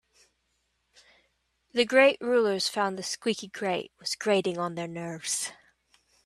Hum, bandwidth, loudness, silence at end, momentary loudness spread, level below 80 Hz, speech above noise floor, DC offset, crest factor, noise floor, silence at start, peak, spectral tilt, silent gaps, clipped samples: 60 Hz at -60 dBFS; 14 kHz; -27 LUFS; 0.7 s; 13 LU; -74 dBFS; 48 dB; under 0.1%; 22 dB; -75 dBFS; 1.75 s; -8 dBFS; -3 dB/octave; none; under 0.1%